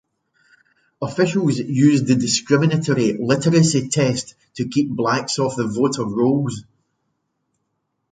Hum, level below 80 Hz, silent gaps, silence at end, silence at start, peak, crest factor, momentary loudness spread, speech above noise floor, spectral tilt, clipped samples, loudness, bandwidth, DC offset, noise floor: none; -58 dBFS; none; 1.5 s; 1 s; -2 dBFS; 18 dB; 11 LU; 55 dB; -5.5 dB/octave; under 0.1%; -19 LUFS; 9.6 kHz; under 0.1%; -73 dBFS